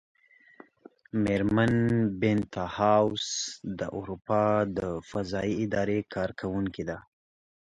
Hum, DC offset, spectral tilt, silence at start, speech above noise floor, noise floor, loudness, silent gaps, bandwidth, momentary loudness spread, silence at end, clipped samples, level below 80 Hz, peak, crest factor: none; under 0.1%; -5.5 dB/octave; 1.15 s; 28 dB; -56 dBFS; -28 LUFS; none; 10.5 kHz; 10 LU; 0.75 s; under 0.1%; -54 dBFS; -10 dBFS; 20 dB